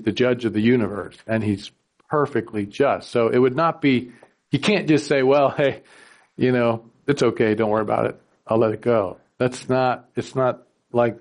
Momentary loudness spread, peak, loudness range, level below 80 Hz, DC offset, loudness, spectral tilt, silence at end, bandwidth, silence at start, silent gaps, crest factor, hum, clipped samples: 10 LU; -6 dBFS; 2 LU; -60 dBFS; under 0.1%; -21 LUFS; -6.5 dB/octave; 0 s; 11 kHz; 0 s; none; 14 dB; none; under 0.1%